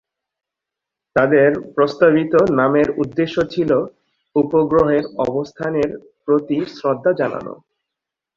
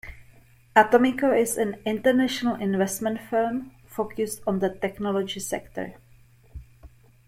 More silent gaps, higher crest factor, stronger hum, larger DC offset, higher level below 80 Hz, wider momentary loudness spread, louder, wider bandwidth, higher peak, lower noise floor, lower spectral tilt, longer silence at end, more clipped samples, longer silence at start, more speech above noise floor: neither; second, 16 dB vs 22 dB; neither; neither; about the same, -50 dBFS vs -54 dBFS; second, 9 LU vs 13 LU; first, -17 LUFS vs -24 LUFS; second, 7.2 kHz vs 16.5 kHz; about the same, -2 dBFS vs -4 dBFS; first, -84 dBFS vs -54 dBFS; first, -8 dB/octave vs -4.5 dB/octave; first, 0.8 s vs 0.4 s; neither; first, 1.15 s vs 0.05 s; first, 68 dB vs 30 dB